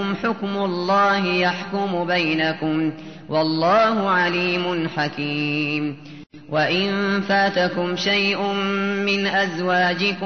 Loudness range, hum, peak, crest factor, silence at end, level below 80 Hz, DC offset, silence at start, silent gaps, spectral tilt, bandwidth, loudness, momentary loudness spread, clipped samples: 2 LU; none; -8 dBFS; 14 dB; 0 s; -62 dBFS; 0.3%; 0 s; none; -5.5 dB/octave; 6.6 kHz; -20 LUFS; 6 LU; under 0.1%